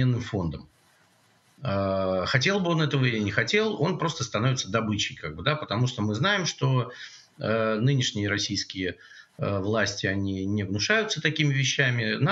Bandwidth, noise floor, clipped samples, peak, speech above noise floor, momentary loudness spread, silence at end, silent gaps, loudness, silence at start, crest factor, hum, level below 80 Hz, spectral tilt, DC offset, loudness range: 8 kHz; -62 dBFS; under 0.1%; -6 dBFS; 37 dB; 8 LU; 0 s; none; -26 LUFS; 0 s; 20 dB; none; -58 dBFS; -5 dB/octave; under 0.1%; 2 LU